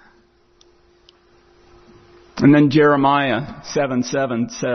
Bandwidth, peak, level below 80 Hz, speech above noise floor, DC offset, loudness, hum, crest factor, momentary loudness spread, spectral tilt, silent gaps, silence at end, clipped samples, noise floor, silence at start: 6.4 kHz; -2 dBFS; -54 dBFS; 39 dB; under 0.1%; -17 LUFS; none; 16 dB; 11 LU; -6 dB/octave; none; 0 s; under 0.1%; -56 dBFS; 2.35 s